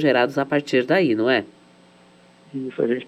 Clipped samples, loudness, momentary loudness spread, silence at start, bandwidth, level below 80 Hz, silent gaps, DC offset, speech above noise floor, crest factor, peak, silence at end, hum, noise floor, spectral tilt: under 0.1%; -21 LUFS; 14 LU; 0 s; 12.5 kHz; -72 dBFS; none; under 0.1%; 32 dB; 16 dB; -6 dBFS; 0 s; none; -52 dBFS; -6 dB/octave